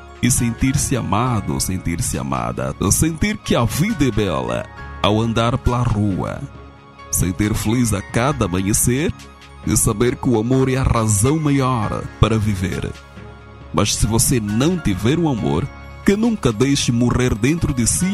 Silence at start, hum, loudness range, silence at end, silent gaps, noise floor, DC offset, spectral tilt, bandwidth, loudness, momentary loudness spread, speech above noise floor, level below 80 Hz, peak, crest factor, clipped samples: 0 s; none; 2 LU; 0 s; none; -39 dBFS; under 0.1%; -5 dB/octave; 14.5 kHz; -18 LUFS; 8 LU; 22 dB; -32 dBFS; 0 dBFS; 18 dB; under 0.1%